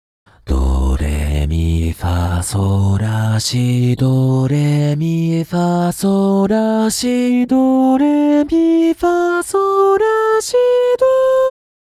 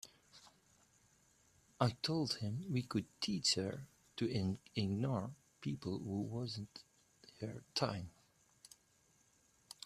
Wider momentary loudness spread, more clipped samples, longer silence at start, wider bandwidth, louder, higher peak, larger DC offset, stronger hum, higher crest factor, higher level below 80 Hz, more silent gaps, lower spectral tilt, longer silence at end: second, 5 LU vs 21 LU; neither; first, 0.45 s vs 0.05 s; about the same, 15 kHz vs 14 kHz; first, -15 LUFS vs -40 LUFS; first, -4 dBFS vs -18 dBFS; neither; neither; second, 10 dB vs 24 dB; first, -26 dBFS vs -72 dBFS; neither; first, -6.5 dB/octave vs -5 dB/octave; second, 0.5 s vs 1.75 s